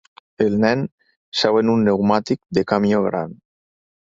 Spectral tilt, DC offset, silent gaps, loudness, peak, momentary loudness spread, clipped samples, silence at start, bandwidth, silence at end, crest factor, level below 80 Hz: -6.5 dB/octave; under 0.1%; 0.92-0.98 s, 1.16-1.32 s; -19 LUFS; -2 dBFS; 9 LU; under 0.1%; 0.4 s; 7.6 kHz; 0.85 s; 18 dB; -54 dBFS